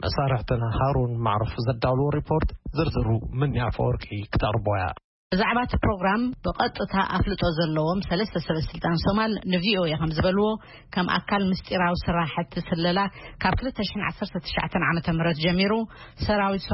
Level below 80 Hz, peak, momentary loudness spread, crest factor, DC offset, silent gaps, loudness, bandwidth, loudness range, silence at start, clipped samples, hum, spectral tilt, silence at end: -38 dBFS; -10 dBFS; 6 LU; 16 dB; under 0.1%; 5.04-5.30 s; -25 LUFS; 5.8 kHz; 2 LU; 0 s; under 0.1%; none; -10.5 dB/octave; 0 s